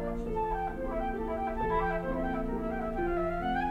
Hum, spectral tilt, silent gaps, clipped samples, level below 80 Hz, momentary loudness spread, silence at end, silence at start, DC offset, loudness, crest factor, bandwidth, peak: none; -8 dB/octave; none; under 0.1%; -40 dBFS; 4 LU; 0 s; 0 s; under 0.1%; -33 LUFS; 14 dB; 13.5 kHz; -18 dBFS